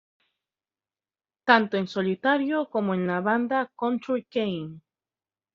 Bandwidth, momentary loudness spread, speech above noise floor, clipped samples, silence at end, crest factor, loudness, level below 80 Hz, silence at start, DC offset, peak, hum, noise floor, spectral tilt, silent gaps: 7.2 kHz; 9 LU; over 65 dB; under 0.1%; 0.75 s; 24 dB; -25 LUFS; -72 dBFS; 1.45 s; under 0.1%; -4 dBFS; none; under -90 dBFS; -4 dB/octave; none